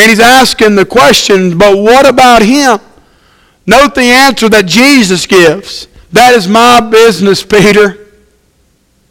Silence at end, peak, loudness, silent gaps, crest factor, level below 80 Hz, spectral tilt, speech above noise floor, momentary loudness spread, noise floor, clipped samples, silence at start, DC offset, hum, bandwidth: 1.15 s; 0 dBFS; -4 LUFS; none; 6 dB; -34 dBFS; -3.5 dB/octave; 46 dB; 6 LU; -50 dBFS; 7%; 0 s; under 0.1%; none; over 20 kHz